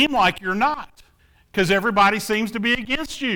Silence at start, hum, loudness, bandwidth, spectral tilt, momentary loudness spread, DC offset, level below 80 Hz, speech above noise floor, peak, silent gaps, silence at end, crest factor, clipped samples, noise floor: 0 s; none; -20 LUFS; 19 kHz; -4 dB/octave; 7 LU; under 0.1%; -48 dBFS; 37 dB; -6 dBFS; none; 0 s; 16 dB; under 0.1%; -57 dBFS